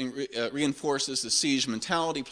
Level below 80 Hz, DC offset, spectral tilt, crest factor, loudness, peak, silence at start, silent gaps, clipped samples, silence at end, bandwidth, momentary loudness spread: -64 dBFS; under 0.1%; -2.5 dB/octave; 18 dB; -28 LUFS; -12 dBFS; 0 s; none; under 0.1%; 0 s; 10.5 kHz; 7 LU